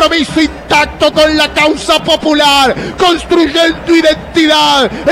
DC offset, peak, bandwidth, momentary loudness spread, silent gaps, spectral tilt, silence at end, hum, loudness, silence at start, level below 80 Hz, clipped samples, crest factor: under 0.1%; -2 dBFS; 16.5 kHz; 4 LU; none; -3.5 dB/octave; 0 s; none; -9 LUFS; 0 s; -32 dBFS; under 0.1%; 8 dB